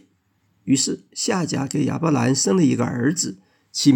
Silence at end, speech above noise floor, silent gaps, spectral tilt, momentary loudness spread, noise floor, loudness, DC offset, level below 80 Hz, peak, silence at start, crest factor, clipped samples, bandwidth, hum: 0 s; 45 dB; none; -4.5 dB/octave; 7 LU; -65 dBFS; -21 LUFS; under 0.1%; -64 dBFS; -4 dBFS; 0.65 s; 18 dB; under 0.1%; 17 kHz; none